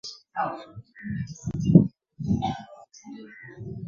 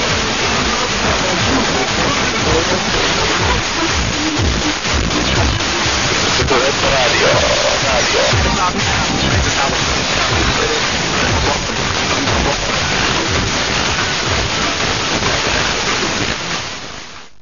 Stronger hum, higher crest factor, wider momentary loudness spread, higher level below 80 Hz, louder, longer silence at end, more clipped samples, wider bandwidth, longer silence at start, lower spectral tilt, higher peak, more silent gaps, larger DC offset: neither; first, 26 dB vs 14 dB; first, 25 LU vs 3 LU; second, -48 dBFS vs -28 dBFS; second, -26 LUFS vs -14 LUFS; second, 0 s vs 0.15 s; neither; about the same, 7.4 kHz vs 7.4 kHz; about the same, 0.05 s vs 0 s; first, -7.5 dB/octave vs -3 dB/octave; about the same, -2 dBFS vs 0 dBFS; neither; second, under 0.1% vs 2%